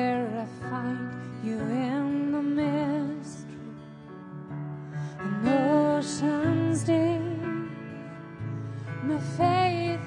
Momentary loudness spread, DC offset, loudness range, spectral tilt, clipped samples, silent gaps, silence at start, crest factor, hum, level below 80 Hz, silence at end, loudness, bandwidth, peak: 17 LU; under 0.1%; 5 LU; -6.5 dB/octave; under 0.1%; none; 0 s; 16 dB; none; -64 dBFS; 0 s; -28 LUFS; 11 kHz; -12 dBFS